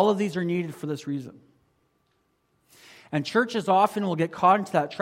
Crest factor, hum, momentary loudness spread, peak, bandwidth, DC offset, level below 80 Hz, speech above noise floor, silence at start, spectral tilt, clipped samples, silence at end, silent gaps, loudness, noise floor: 20 dB; none; 12 LU; -6 dBFS; 16.5 kHz; under 0.1%; -72 dBFS; 46 dB; 0 s; -6 dB/octave; under 0.1%; 0 s; none; -25 LUFS; -70 dBFS